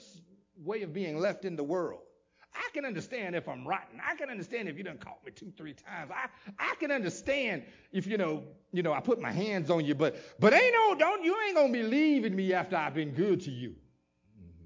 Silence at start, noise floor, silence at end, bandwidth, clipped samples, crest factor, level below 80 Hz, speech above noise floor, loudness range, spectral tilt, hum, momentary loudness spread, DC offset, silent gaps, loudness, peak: 0.15 s; -68 dBFS; 0 s; 7.6 kHz; under 0.1%; 22 dB; -70 dBFS; 37 dB; 11 LU; -6 dB/octave; none; 17 LU; under 0.1%; none; -31 LUFS; -10 dBFS